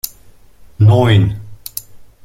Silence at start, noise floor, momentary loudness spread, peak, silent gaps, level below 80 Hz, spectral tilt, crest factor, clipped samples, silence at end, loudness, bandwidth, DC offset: 0.05 s; -42 dBFS; 18 LU; 0 dBFS; none; -40 dBFS; -6.5 dB/octave; 14 dB; under 0.1%; 0.2 s; -12 LUFS; 16.5 kHz; under 0.1%